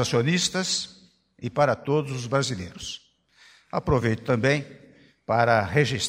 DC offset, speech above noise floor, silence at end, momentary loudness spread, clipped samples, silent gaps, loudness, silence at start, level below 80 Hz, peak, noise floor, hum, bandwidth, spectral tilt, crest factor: under 0.1%; 33 dB; 0 s; 15 LU; under 0.1%; none; -24 LUFS; 0 s; -48 dBFS; -6 dBFS; -57 dBFS; none; 15.5 kHz; -4.5 dB/octave; 20 dB